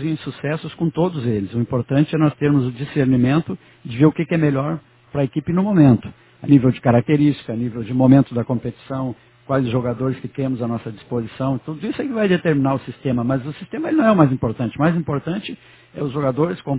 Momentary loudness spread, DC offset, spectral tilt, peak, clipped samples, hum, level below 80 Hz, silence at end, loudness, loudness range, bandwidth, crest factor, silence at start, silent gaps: 13 LU; under 0.1%; -12.5 dB/octave; 0 dBFS; under 0.1%; none; -50 dBFS; 0 s; -19 LUFS; 5 LU; 4 kHz; 18 dB; 0 s; none